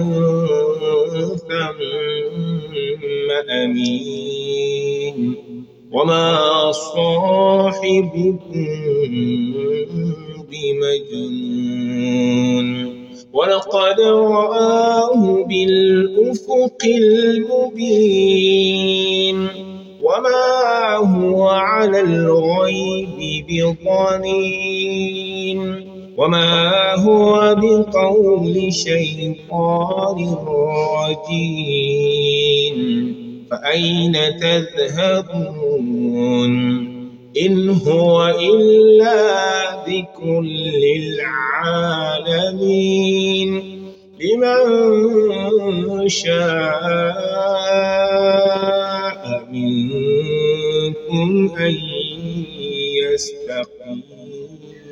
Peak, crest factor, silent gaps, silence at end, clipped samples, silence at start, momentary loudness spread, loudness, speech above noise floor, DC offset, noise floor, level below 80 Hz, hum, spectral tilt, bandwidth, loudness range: -2 dBFS; 14 dB; none; 0 s; under 0.1%; 0 s; 11 LU; -16 LUFS; 21 dB; under 0.1%; -37 dBFS; -54 dBFS; none; -5.5 dB/octave; 8 kHz; 6 LU